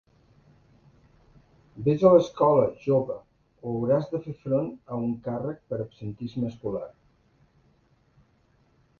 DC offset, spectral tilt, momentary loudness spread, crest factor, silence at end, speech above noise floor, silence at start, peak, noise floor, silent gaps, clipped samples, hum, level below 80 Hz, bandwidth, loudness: under 0.1%; -9 dB/octave; 16 LU; 22 dB; 2.1 s; 39 dB; 1.75 s; -6 dBFS; -64 dBFS; none; under 0.1%; none; -60 dBFS; 7 kHz; -26 LUFS